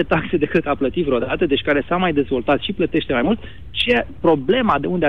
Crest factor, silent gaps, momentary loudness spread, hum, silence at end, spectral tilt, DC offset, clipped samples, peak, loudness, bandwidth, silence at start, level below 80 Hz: 14 dB; none; 4 LU; none; 0 s; -7.5 dB/octave; 2%; under 0.1%; -6 dBFS; -19 LUFS; 10.5 kHz; 0 s; -40 dBFS